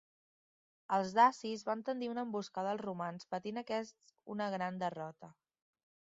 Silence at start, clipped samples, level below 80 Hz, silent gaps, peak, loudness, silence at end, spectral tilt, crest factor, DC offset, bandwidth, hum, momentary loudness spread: 0.9 s; under 0.1%; -84 dBFS; none; -14 dBFS; -37 LUFS; 0.8 s; -4 dB/octave; 24 dB; under 0.1%; 7.6 kHz; none; 13 LU